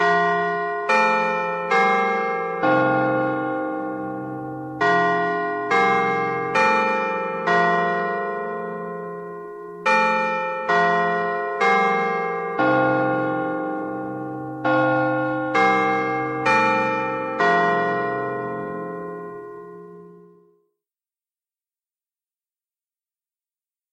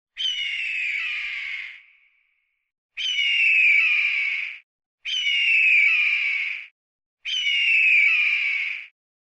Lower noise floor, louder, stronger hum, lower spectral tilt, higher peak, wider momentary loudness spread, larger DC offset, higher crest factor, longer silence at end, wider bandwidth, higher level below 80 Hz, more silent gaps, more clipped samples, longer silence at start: first, under -90 dBFS vs -71 dBFS; about the same, -21 LUFS vs -19 LUFS; neither; first, -6 dB/octave vs 5 dB/octave; first, -6 dBFS vs -10 dBFS; second, 13 LU vs 17 LU; neither; about the same, 16 dB vs 14 dB; first, 3.75 s vs 0.35 s; about the same, 9.6 kHz vs 8.8 kHz; first, -64 dBFS vs -70 dBFS; second, none vs 2.78-2.89 s, 4.63-4.79 s, 4.86-4.98 s, 6.71-6.99 s, 7.06-7.17 s; neither; second, 0 s vs 0.15 s